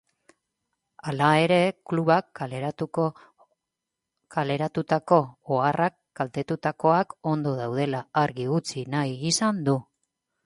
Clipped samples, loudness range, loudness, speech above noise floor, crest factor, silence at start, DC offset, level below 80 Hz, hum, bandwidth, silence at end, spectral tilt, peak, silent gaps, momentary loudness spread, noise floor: under 0.1%; 3 LU; -25 LUFS; 61 dB; 22 dB; 1.05 s; under 0.1%; -66 dBFS; none; 11.5 kHz; 0.65 s; -5.5 dB/octave; -4 dBFS; none; 9 LU; -85 dBFS